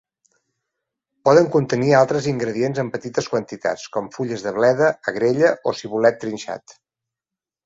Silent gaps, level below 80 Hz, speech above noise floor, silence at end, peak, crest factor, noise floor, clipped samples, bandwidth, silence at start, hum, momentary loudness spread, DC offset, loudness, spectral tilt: none; -60 dBFS; 69 dB; 0.95 s; -2 dBFS; 20 dB; -88 dBFS; under 0.1%; 8 kHz; 1.25 s; none; 12 LU; under 0.1%; -20 LUFS; -6 dB/octave